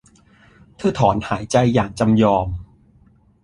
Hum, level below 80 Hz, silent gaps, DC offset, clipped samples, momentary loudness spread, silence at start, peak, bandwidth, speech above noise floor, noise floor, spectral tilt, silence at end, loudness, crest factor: none; -40 dBFS; none; under 0.1%; under 0.1%; 8 LU; 0.8 s; -2 dBFS; 11 kHz; 36 dB; -53 dBFS; -6.5 dB/octave; 0.8 s; -18 LUFS; 18 dB